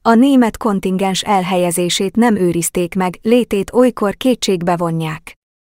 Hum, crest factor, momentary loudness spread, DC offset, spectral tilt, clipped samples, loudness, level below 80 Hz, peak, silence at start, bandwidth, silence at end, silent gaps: none; 14 dB; 6 LU; under 0.1%; -5 dB/octave; under 0.1%; -15 LUFS; -46 dBFS; 0 dBFS; 0.05 s; 16.5 kHz; 0.45 s; none